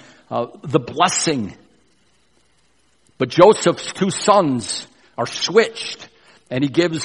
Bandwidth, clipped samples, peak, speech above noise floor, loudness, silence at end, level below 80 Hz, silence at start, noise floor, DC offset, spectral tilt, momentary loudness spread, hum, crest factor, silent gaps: 11.5 kHz; under 0.1%; 0 dBFS; 44 dB; -18 LUFS; 0 s; -58 dBFS; 0.3 s; -61 dBFS; under 0.1%; -4 dB/octave; 15 LU; none; 20 dB; none